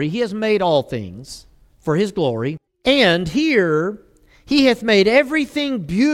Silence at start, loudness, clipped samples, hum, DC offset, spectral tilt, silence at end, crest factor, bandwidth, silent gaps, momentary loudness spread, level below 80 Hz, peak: 0 s; -17 LUFS; under 0.1%; none; under 0.1%; -5.5 dB/octave; 0 s; 16 dB; 15 kHz; none; 15 LU; -48 dBFS; -2 dBFS